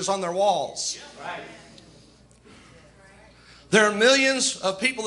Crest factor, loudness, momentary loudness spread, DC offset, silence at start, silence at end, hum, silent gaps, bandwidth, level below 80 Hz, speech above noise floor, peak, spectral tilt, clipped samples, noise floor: 22 dB; -21 LUFS; 18 LU; under 0.1%; 0 s; 0 s; none; none; 11.5 kHz; -62 dBFS; 30 dB; -4 dBFS; -2 dB/octave; under 0.1%; -53 dBFS